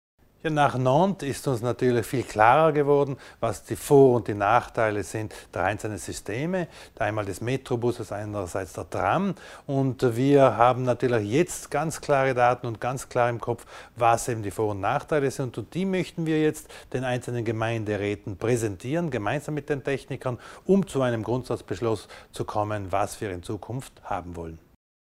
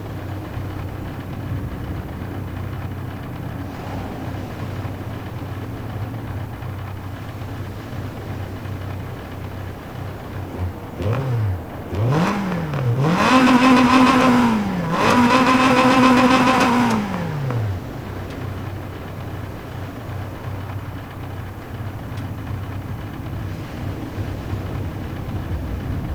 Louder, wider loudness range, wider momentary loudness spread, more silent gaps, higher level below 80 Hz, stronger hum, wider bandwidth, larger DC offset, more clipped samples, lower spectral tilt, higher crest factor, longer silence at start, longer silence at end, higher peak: second, -25 LUFS vs -21 LUFS; second, 7 LU vs 16 LU; second, 13 LU vs 18 LU; neither; second, -52 dBFS vs -38 dBFS; neither; second, 16 kHz vs over 20 kHz; neither; neither; about the same, -6 dB/octave vs -6 dB/octave; about the same, 22 dB vs 22 dB; first, 0.45 s vs 0 s; first, 0.6 s vs 0 s; second, -4 dBFS vs 0 dBFS